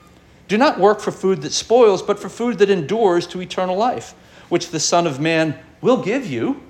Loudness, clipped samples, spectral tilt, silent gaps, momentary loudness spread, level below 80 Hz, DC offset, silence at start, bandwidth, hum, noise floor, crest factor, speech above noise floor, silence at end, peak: -18 LUFS; under 0.1%; -4.5 dB/octave; none; 9 LU; -56 dBFS; under 0.1%; 0.5 s; 13 kHz; none; -46 dBFS; 16 dB; 29 dB; 0.1 s; -2 dBFS